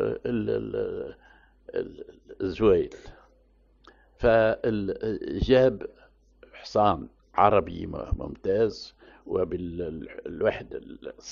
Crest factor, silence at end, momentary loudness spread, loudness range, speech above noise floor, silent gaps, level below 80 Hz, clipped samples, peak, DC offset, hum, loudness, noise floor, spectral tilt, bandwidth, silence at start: 22 dB; 0 s; 19 LU; 5 LU; 35 dB; none; -44 dBFS; under 0.1%; -6 dBFS; under 0.1%; none; -26 LUFS; -61 dBFS; -5.5 dB/octave; 7.2 kHz; 0 s